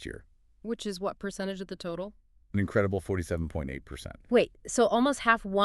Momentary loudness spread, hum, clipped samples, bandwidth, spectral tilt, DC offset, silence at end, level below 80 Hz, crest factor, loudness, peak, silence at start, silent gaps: 18 LU; none; under 0.1%; 13 kHz; -5 dB/octave; under 0.1%; 0 s; -50 dBFS; 22 dB; -30 LUFS; -8 dBFS; 0 s; none